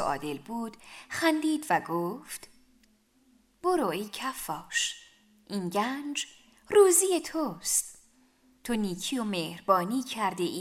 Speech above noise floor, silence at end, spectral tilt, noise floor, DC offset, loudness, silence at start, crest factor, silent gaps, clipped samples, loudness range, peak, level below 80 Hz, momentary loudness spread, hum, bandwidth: 37 dB; 0 s; -3 dB/octave; -65 dBFS; under 0.1%; -29 LUFS; 0 s; 22 dB; none; under 0.1%; 6 LU; -8 dBFS; -64 dBFS; 15 LU; none; 16 kHz